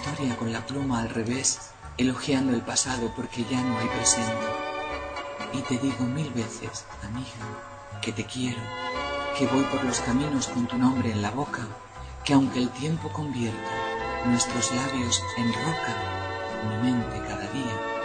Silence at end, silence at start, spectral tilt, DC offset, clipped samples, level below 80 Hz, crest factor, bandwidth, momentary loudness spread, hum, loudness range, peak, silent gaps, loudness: 0 s; 0 s; -4 dB/octave; under 0.1%; under 0.1%; -50 dBFS; 22 dB; 9.4 kHz; 10 LU; none; 5 LU; -6 dBFS; none; -27 LUFS